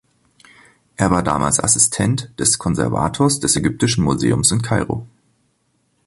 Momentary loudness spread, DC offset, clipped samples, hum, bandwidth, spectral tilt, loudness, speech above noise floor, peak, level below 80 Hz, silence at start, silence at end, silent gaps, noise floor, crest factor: 7 LU; under 0.1%; under 0.1%; none; 12 kHz; -4 dB/octave; -17 LUFS; 48 dB; -2 dBFS; -40 dBFS; 1 s; 1 s; none; -65 dBFS; 18 dB